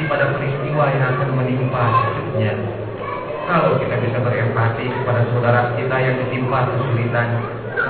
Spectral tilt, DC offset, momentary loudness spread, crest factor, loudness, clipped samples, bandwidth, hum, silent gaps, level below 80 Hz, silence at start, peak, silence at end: -11.5 dB/octave; 0.4%; 7 LU; 16 dB; -19 LUFS; under 0.1%; 4.5 kHz; none; none; -48 dBFS; 0 s; -2 dBFS; 0 s